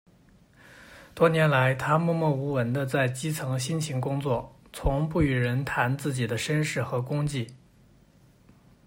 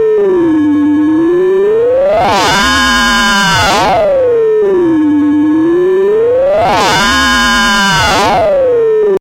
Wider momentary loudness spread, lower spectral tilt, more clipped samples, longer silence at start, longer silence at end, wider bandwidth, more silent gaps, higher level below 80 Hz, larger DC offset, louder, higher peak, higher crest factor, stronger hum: first, 8 LU vs 2 LU; first, -6 dB/octave vs -3.5 dB/octave; neither; first, 0.7 s vs 0 s; first, 1.3 s vs 0 s; about the same, 16 kHz vs 16 kHz; neither; second, -44 dBFS vs -30 dBFS; neither; second, -27 LUFS vs -9 LUFS; second, -8 dBFS vs -2 dBFS; first, 20 dB vs 6 dB; neither